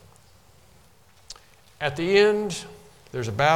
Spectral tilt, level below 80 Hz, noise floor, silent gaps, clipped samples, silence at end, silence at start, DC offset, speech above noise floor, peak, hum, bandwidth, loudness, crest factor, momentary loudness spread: -4.5 dB/octave; -56 dBFS; -56 dBFS; none; under 0.1%; 0 s; 1.3 s; 0.1%; 35 dB; -6 dBFS; none; 13.5 kHz; -24 LUFS; 20 dB; 25 LU